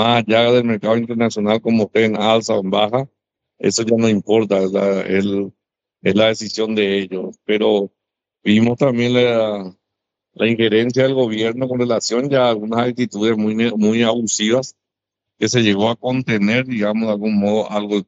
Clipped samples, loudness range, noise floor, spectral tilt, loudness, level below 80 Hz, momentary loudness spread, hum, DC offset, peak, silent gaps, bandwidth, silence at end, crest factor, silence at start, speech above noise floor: under 0.1%; 2 LU; -83 dBFS; -5 dB/octave; -17 LUFS; -60 dBFS; 6 LU; none; under 0.1%; -2 dBFS; none; 8 kHz; 0.05 s; 16 dB; 0 s; 66 dB